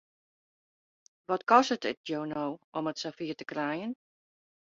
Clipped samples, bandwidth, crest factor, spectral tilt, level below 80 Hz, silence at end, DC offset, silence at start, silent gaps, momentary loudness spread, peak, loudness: under 0.1%; 7.8 kHz; 24 dB; -4.5 dB/octave; -76 dBFS; 0.75 s; under 0.1%; 1.3 s; 1.97-2.04 s, 2.64-2.72 s; 13 LU; -8 dBFS; -31 LUFS